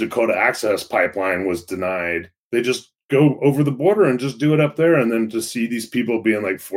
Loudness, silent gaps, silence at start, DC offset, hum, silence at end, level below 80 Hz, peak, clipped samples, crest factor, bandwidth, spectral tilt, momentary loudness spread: -19 LUFS; 2.38-2.51 s, 3.04-3.09 s; 0 s; under 0.1%; none; 0 s; -60 dBFS; -4 dBFS; under 0.1%; 16 dB; 16.5 kHz; -6 dB/octave; 8 LU